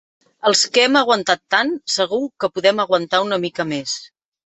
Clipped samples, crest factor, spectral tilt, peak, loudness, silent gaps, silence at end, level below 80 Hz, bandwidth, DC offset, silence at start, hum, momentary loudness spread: under 0.1%; 18 dB; -2.5 dB/octave; -2 dBFS; -18 LUFS; none; 0.4 s; -66 dBFS; 8.4 kHz; under 0.1%; 0.45 s; none; 9 LU